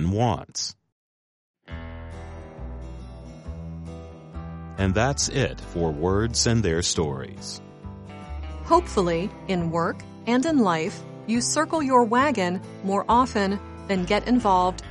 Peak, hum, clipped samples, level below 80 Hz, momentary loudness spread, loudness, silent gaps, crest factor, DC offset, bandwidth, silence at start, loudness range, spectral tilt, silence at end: -6 dBFS; none; under 0.1%; -40 dBFS; 19 LU; -23 LUFS; 0.92-1.54 s; 20 dB; under 0.1%; 11.5 kHz; 0 s; 15 LU; -4.5 dB/octave; 0 s